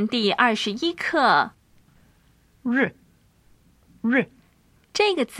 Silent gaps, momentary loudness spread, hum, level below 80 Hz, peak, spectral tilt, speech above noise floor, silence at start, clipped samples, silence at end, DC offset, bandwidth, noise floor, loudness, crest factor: none; 11 LU; none; -64 dBFS; -4 dBFS; -4 dB/octave; 38 dB; 0 s; under 0.1%; 0 s; under 0.1%; 13.5 kHz; -59 dBFS; -22 LUFS; 20 dB